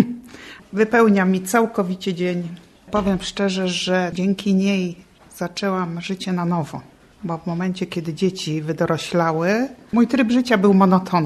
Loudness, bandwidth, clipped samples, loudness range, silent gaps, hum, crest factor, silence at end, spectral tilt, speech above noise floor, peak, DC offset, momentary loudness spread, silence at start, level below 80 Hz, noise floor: -20 LUFS; 13 kHz; under 0.1%; 5 LU; none; none; 18 dB; 0 s; -6 dB/octave; 21 dB; -2 dBFS; under 0.1%; 13 LU; 0 s; -52 dBFS; -41 dBFS